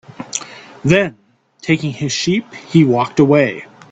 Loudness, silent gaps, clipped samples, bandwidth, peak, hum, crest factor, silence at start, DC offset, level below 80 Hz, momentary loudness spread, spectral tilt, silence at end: -16 LUFS; none; under 0.1%; 8.8 kHz; 0 dBFS; none; 16 dB; 0.2 s; under 0.1%; -52 dBFS; 13 LU; -5.5 dB/octave; 0.25 s